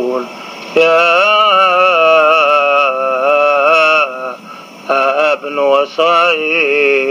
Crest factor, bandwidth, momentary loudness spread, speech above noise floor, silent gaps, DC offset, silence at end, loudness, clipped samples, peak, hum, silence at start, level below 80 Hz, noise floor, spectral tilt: 12 dB; 15 kHz; 11 LU; 22 dB; none; under 0.1%; 0 s; -10 LUFS; under 0.1%; 0 dBFS; none; 0 s; -70 dBFS; -32 dBFS; -3 dB/octave